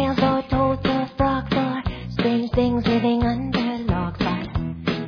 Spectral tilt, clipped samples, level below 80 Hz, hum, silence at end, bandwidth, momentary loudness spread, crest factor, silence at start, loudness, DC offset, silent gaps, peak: -8 dB/octave; under 0.1%; -36 dBFS; none; 0 s; 5.4 kHz; 6 LU; 16 dB; 0 s; -22 LUFS; under 0.1%; none; -6 dBFS